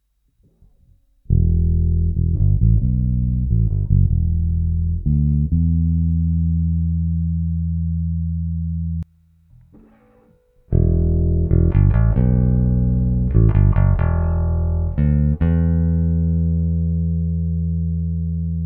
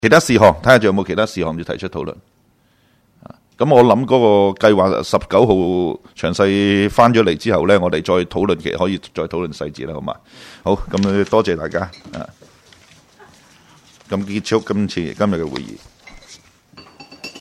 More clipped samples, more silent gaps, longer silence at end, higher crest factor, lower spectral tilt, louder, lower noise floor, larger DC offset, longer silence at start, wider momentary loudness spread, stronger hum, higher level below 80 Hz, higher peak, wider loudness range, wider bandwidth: neither; neither; about the same, 0 s vs 0 s; about the same, 16 dB vs 16 dB; first, -13.5 dB/octave vs -6 dB/octave; second, -19 LUFS vs -16 LUFS; about the same, -60 dBFS vs -57 dBFS; neither; first, 1.3 s vs 0.05 s; second, 6 LU vs 16 LU; neither; first, -22 dBFS vs -44 dBFS; about the same, -2 dBFS vs 0 dBFS; second, 6 LU vs 9 LU; second, 2.6 kHz vs 15.5 kHz